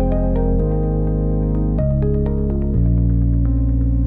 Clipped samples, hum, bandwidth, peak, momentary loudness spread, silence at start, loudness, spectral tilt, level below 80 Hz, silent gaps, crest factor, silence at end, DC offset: under 0.1%; none; 2.5 kHz; -6 dBFS; 3 LU; 0 s; -19 LUFS; -14 dB/octave; -18 dBFS; none; 10 dB; 0 s; under 0.1%